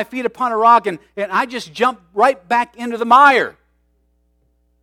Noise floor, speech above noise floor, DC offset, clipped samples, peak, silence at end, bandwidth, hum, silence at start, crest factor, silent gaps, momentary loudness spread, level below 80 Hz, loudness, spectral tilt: -61 dBFS; 46 dB; under 0.1%; under 0.1%; 0 dBFS; 1.3 s; 15.5 kHz; none; 0 s; 16 dB; none; 14 LU; -62 dBFS; -15 LUFS; -4 dB/octave